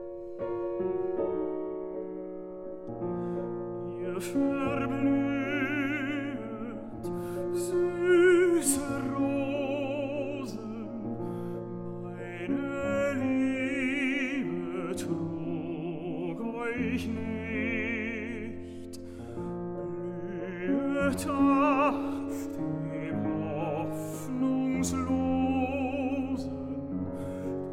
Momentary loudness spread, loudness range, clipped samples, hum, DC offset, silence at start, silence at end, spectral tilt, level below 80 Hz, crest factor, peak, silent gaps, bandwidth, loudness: 11 LU; 7 LU; under 0.1%; none; under 0.1%; 0 s; 0 s; -5.5 dB/octave; -58 dBFS; 18 dB; -12 dBFS; none; 16 kHz; -31 LUFS